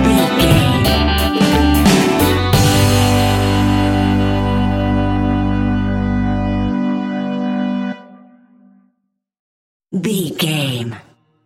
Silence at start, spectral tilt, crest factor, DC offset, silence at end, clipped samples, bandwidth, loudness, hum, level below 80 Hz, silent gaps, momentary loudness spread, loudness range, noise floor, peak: 0 s; -5.5 dB/octave; 16 dB; under 0.1%; 0.45 s; under 0.1%; 17 kHz; -15 LUFS; none; -26 dBFS; 9.39-9.80 s; 9 LU; 10 LU; -70 dBFS; 0 dBFS